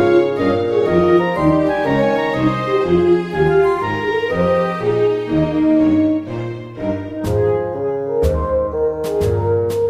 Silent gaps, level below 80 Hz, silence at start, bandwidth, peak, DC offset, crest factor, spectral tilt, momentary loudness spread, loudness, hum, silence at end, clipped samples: none; -34 dBFS; 0 s; 14.5 kHz; -2 dBFS; under 0.1%; 14 dB; -8 dB/octave; 7 LU; -17 LUFS; none; 0 s; under 0.1%